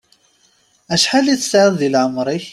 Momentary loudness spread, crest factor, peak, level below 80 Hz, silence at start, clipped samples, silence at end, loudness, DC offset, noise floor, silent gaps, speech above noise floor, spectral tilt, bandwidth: 6 LU; 16 dB; -2 dBFS; -58 dBFS; 0.9 s; under 0.1%; 0 s; -15 LUFS; under 0.1%; -57 dBFS; none; 42 dB; -3.5 dB/octave; 14.5 kHz